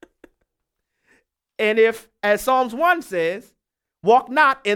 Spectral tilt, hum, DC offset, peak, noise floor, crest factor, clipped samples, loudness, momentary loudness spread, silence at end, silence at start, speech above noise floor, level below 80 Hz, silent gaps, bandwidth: -4 dB/octave; none; under 0.1%; -4 dBFS; -79 dBFS; 16 dB; under 0.1%; -19 LUFS; 8 LU; 0 s; 1.6 s; 61 dB; -60 dBFS; none; 17 kHz